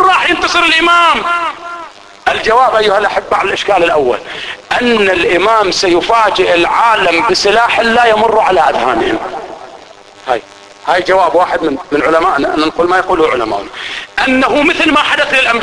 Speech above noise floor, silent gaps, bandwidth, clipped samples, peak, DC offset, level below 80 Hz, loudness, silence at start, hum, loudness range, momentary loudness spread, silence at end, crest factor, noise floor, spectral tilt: 25 dB; none; 11 kHz; under 0.1%; 0 dBFS; under 0.1%; -40 dBFS; -10 LUFS; 0 s; none; 4 LU; 10 LU; 0 s; 12 dB; -36 dBFS; -3 dB/octave